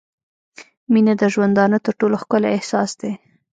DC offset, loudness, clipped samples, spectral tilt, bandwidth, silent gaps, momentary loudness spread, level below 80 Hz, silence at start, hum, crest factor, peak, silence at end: under 0.1%; -18 LUFS; under 0.1%; -6 dB/octave; 9 kHz; 0.77-0.87 s; 10 LU; -66 dBFS; 0.6 s; none; 16 dB; -4 dBFS; 0.45 s